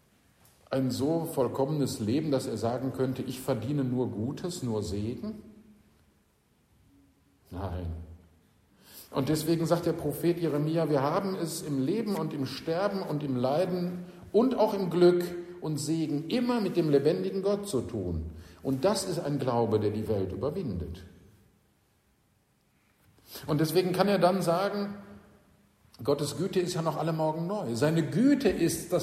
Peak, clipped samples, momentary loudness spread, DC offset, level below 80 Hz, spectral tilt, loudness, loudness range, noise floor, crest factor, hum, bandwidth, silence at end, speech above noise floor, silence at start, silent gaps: -10 dBFS; under 0.1%; 11 LU; under 0.1%; -56 dBFS; -6.5 dB/octave; -29 LUFS; 10 LU; -69 dBFS; 18 dB; none; 15.5 kHz; 0 s; 40 dB; 0.7 s; none